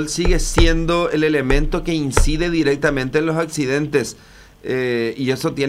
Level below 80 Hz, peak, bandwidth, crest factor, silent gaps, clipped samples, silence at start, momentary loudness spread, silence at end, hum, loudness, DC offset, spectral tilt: -24 dBFS; 0 dBFS; 14.5 kHz; 18 dB; none; under 0.1%; 0 s; 5 LU; 0 s; none; -19 LUFS; under 0.1%; -5 dB/octave